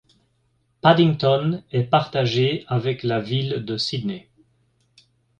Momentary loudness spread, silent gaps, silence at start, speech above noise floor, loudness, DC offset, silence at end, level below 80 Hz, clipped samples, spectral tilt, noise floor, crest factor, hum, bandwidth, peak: 9 LU; none; 0.85 s; 46 dB; -21 LUFS; under 0.1%; 1.2 s; -58 dBFS; under 0.1%; -7 dB/octave; -67 dBFS; 20 dB; none; 9.2 kHz; -2 dBFS